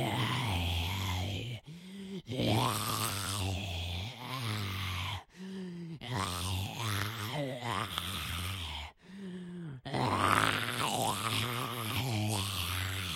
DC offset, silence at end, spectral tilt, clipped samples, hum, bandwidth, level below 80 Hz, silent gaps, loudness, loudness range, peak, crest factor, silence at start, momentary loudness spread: under 0.1%; 0 s; -4 dB/octave; under 0.1%; none; 16.5 kHz; -58 dBFS; none; -34 LUFS; 5 LU; -10 dBFS; 26 dB; 0 s; 13 LU